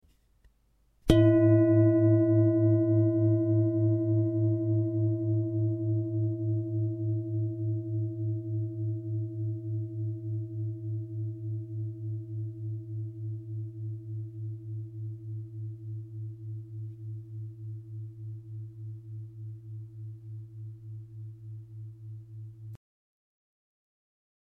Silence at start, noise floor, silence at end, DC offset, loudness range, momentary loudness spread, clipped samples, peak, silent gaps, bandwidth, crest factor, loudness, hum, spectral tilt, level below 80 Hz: 1.05 s; -68 dBFS; 1.7 s; under 0.1%; 20 LU; 21 LU; under 0.1%; -6 dBFS; none; 4.1 kHz; 24 dB; -29 LUFS; none; -10 dB/octave; -52 dBFS